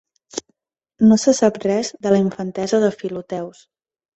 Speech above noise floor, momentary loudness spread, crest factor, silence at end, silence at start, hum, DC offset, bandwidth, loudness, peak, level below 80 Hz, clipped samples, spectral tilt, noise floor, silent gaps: 51 dB; 18 LU; 18 dB; 0.65 s; 0.35 s; none; under 0.1%; 8.2 kHz; -18 LUFS; -2 dBFS; -58 dBFS; under 0.1%; -5.5 dB/octave; -68 dBFS; none